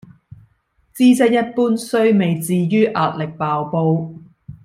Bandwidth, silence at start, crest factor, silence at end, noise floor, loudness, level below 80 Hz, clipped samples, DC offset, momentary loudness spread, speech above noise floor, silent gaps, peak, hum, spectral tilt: 15.5 kHz; 0.95 s; 14 dB; 0.15 s; -61 dBFS; -17 LUFS; -58 dBFS; under 0.1%; under 0.1%; 7 LU; 45 dB; none; -2 dBFS; none; -6.5 dB/octave